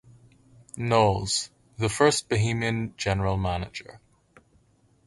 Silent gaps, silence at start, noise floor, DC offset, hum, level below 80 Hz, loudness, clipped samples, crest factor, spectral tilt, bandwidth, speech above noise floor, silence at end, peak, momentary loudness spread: none; 0.75 s; -63 dBFS; under 0.1%; none; -46 dBFS; -25 LUFS; under 0.1%; 22 dB; -4.5 dB/octave; 11.5 kHz; 38 dB; 1.1 s; -6 dBFS; 15 LU